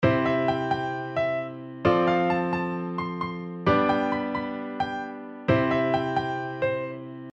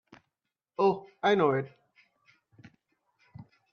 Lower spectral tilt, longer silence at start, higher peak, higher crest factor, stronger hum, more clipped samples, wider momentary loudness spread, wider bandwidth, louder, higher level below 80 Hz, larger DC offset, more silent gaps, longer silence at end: about the same, -8 dB/octave vs -7 dB/octave; second, 0 s vs 0.8 s; first, -8 dBFS vs -12 dBFS; about the same, 18 dB vs 20 dB; neither; neither; second, 10 LU vs 17 LU; first, 8 kHz vs 6.6 kHz; about the same, -26 LUFS vs -28 LUFS; first, -54 dBFS vs -76 dBFS; neither; neither; second, 0.05 s vs 0.3 s